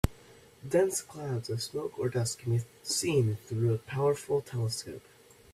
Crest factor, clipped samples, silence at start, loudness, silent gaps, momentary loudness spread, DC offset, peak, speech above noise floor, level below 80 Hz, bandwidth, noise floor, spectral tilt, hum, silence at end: 24 dB; under 0.1%; 0.05 s; -31 LUFS; none; 8 LU; under 0.1%; -8 dBFS; 25 dB; -50 dBFS; 15.5 kHz; -56 dBFS; -5 dB/octave; none; 0.55 s